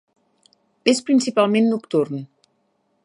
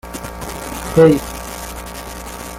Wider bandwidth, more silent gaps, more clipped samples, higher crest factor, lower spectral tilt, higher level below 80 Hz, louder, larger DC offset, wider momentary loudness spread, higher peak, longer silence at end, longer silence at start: second, 11 kHz vs 17 kHz; neither; neither; about the same, 20 dB vs 18 dB; about the same, -5 dB/octave vs -6 dB/octave; second, -74 dBFS vs -36 dBFS; about the same, -19 LUFS vs -17 LUFS; neither; second, 8 LU vs 18 LU; about the same, 0 dBFS vs -2 dBFS; first, 0.8 s vs 0 s; first, 0.85 s vs 0.05 s